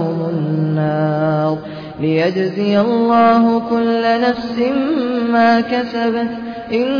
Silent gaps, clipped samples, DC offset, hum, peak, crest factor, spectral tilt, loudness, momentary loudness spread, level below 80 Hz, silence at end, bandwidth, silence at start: none; under 0.1%; under 0.1%; none; -2 dBFS; 12 dB; -8.5 dB/octave; -16 LUFS; 8 LU; -52 dBFS; 0 s; 5.4 kHz; 0 s